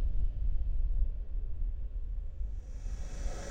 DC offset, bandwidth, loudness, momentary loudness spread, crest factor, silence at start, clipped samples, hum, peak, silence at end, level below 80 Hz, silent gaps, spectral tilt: under 0.1%; 7.8 kHz; -40 LUFS; 7 LU; 14 dB; 0 s; under 0.1%; none; -18 dBFS; 0 s; -32 dBFS; none; -6 dB/octave